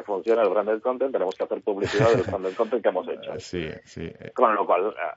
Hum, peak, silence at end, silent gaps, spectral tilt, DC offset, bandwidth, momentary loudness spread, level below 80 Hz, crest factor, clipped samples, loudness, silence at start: none; -4 dBFS; 0 s; none; -6 dB/octave; under 0.1%; 8 kHz; 13 LU; -58 dBFS; 20 dB; under 0.1%; -24 LUFS; 0 s